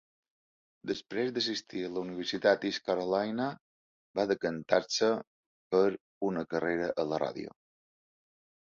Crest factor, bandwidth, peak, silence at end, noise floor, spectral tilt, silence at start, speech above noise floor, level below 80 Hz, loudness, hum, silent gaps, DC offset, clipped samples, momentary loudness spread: 22 dB; 7.6 kHz; -10 dBFS; 1.15 s; under -90 dBFS; -4.5 dB/octave; 0.85 s; over 59 dB; -70 dBFS; -32 LUFS; none; 3.61-4.14 s, 5.27-5.71 s, 6.01-6.21 s; under 0.1%; under 0.1%; 9 LU